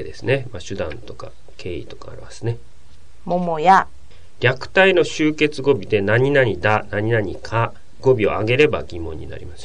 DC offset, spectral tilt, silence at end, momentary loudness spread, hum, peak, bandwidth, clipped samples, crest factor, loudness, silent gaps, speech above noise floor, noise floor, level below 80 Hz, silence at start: 3%; -6 dB/octave; 0 s; 20 LU; none; -2 dBFS; 10 kHz; under 0.1%; 18 dB; -18 LUFS; none; 29 dB; -48 dBFS; -42 dBFS; 0 s